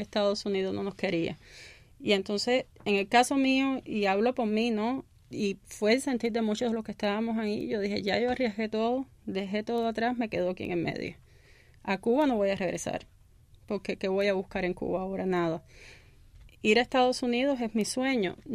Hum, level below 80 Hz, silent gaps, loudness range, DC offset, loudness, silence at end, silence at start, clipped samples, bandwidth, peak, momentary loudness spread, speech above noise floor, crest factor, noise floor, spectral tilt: none; -58 dBFS; none; 4 LU; under 0.1%; -29 LUFS; 0 s; 0 s; under 0.1%; 15 kHz; -10 dBFS; 10 LU; 29 dB; 18 dB; -57 dBFS; -5 dB/octave